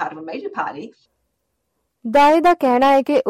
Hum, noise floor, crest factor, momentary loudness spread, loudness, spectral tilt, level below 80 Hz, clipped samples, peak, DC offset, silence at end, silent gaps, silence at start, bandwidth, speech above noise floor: none; -73 dBFS; 12 dB; 17 LU; -16 LUFS; -4.5 dB/octave; -56 dBFS; under 0.1%; -6 dBFS; under 0.1%; 0 s; none; 0 s; 15.5 kHz; 56 dB